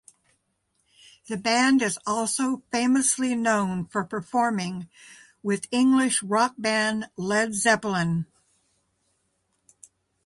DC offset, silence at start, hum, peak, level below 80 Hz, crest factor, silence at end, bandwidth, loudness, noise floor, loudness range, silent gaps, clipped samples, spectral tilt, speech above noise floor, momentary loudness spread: under 0.1%; 1.3 s; none; -8 dBFS; -66 dBFS; 18 dB; 2 s; 11.5 kHz; -24 LUFS; -73 dBFS; 3 LU; none; under 0.1%; -3.5 dB/octave; 49 dB; 10 LU